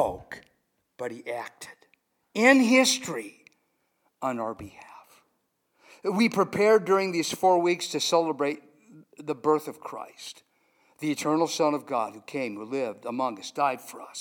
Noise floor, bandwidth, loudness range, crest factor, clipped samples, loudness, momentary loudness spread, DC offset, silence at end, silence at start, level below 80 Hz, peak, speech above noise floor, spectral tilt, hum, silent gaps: -74 dBFS; 19 kHz; 6 LU; 24 dB; under 0.1%; -26 LUFS; 20 LU; under 0.1%; 0 s; 0 s; -66 dBFS; -4 dBFS; 48 dB; -3.5 dB/octave; none; none